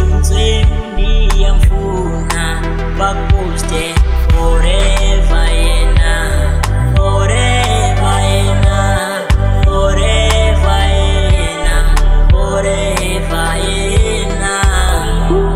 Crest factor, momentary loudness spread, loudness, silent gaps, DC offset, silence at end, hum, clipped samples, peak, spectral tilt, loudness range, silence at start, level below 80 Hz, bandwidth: 10 dB; 4 LU; -13 LUFS; none; under 0.1%; 0 s; none; under 0.1%; 0 dBFS; -5 dB/octave; 2 LU; 0 s; -12 dBFS; 13.5 kHz